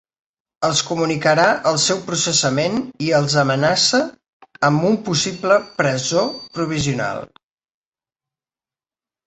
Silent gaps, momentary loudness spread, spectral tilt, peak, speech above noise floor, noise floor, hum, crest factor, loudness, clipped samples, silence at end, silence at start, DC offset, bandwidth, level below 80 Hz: 4.28-4.40 s; 8 LU; -3.5 dB/octave; -2 dBFS; over 72 dB; under -90 dBFS; none; 18 dB; -18 LUFS; under 0.1%; 2 s; 0.6 s; under 0.1%; 8.4 kHz; -54 dBFS